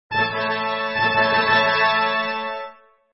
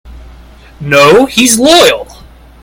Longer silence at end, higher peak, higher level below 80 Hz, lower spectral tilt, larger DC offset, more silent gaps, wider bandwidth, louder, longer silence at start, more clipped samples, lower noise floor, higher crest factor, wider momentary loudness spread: second, 0.4 s vs 0.6 s; second, -4 dBFS vs 0 dBFS; second, -60 dBFS vs -34 dBFS; first, -6.5 dB/octave vs -3 dB/octave; neither; neither; second, 6 kHz vs over 20 kHz; second, -19 LUFS vs -6 LUFS; about the same, 0.1 s vs 0.05 s; second, under 0.1% vs 2%; first, -41 dBFS vs -34 dBFS; first, 16 dB vs 10 dB; about the same, 12 LU vs 11 LU